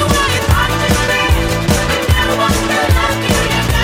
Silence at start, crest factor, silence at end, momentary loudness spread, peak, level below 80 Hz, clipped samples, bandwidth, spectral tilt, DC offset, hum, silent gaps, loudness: 0 s; 12 dB; 0 s; 1 LU; 0 dBFS; -20 dBFS; under 0.1%; 16.5 kHz; -4 dB/octave; under 0.1%; none; none; -13 LUFS